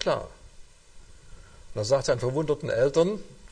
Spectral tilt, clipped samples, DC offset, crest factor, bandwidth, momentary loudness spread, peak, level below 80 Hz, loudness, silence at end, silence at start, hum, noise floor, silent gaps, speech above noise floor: -5.5 dB/octave; under 0.1%; under 0.1%; 20 dB; 10 kHz; 14 LU; -8 dBFS; -48 dBFS; -26 LUFS; 0.05 s; 0 s; none; -49 dBFS; none; 24 dB